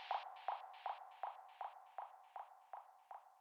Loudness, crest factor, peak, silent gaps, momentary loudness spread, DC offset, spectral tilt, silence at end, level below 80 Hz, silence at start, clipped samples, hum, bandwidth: -52 LUFS; 20 dB; -30 dBFS; none; 11 LU; under 0.1%; 1 dB/octave; 0 s; under -90 dBFS; 0 s; under 0.1%; none; 18 kHz